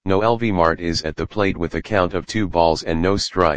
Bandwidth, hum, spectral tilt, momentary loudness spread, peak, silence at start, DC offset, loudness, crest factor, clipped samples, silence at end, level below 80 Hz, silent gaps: 9.8 kHz; none; -5.5 dB/octave; 5 LU; 0 dBFS; 0 s; 2%; -20 LUFS; 18 dB; under 0.1%; 0 s; -38 dBFS; none